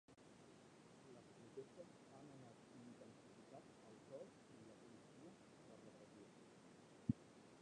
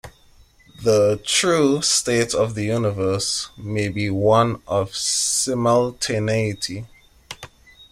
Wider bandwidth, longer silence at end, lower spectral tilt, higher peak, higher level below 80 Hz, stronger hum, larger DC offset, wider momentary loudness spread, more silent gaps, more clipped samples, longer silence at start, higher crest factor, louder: second, 10 kHz vs 15.5 kHz; about the same, 0 s vs 0.1 s; first, -6.5 dB/octave vs -3.5 dB/octave; second, -26 dBFS vs -4 dBFS; second, -78 dBFS vs -50 dBFS; neither; neither; first, 14 LU vs 10 LU; neither; neither; about the same, 0.1 s vs 0.05 s; first, 32 dB vs 18 dB; second, -59 LUFS vs -20 LUFS